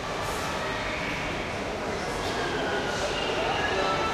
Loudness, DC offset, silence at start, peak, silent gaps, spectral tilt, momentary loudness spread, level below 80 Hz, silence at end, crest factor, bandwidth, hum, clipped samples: -28 LUFS; under 0.1%; 0 s; -14 dBFS; none; -3.5 dB/octave; 5 LU; -44 dBFS; 0 s; 14 dB; 15.5 kHz; none; under 0.1%